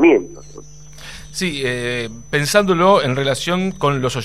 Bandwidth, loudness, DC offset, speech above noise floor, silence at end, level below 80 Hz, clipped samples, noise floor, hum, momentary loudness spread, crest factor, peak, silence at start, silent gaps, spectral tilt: 15.5 kHz; -17 LUFS; 1%; 22 dB; 0 s; -46 dBFS; under 0.1%; -39 dBFS; none; 21 LU; 18 dB; 0 dBFS; 0 s; none; -5 dB/octave